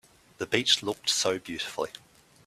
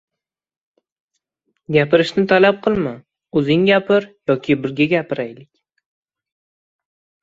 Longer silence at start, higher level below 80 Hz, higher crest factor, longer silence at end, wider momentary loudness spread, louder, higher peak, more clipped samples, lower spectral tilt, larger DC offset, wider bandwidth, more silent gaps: second, 0.4 s vs 1.7 s; second, -68 dBFS vs -56 dBFS; first, 24 dB vs 18 dB; second, 0.5 s vs 1.8 s; about the same, 12 LU vs 10 LU; second, -27 LUFS vs -17 LUFS; second, -6 dBFS vs 0 dBFS; neither; second, -1.5 dB/octave vs -7 dB/octave; neither; first, 15 kHz vs 7.8 kHz; neither